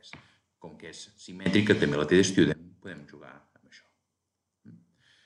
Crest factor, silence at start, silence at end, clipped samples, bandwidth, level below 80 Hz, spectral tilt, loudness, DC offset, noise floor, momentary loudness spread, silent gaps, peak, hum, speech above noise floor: 22 dB; 0.15 s; 2.2 s; under 0.1%; 11.5 kHz; -60 dBFS; -5 dB/octave; -25 LUFS; under 0.1%; -83 dBFS; 23 LU; none; -8 dBFS; none; 56 dB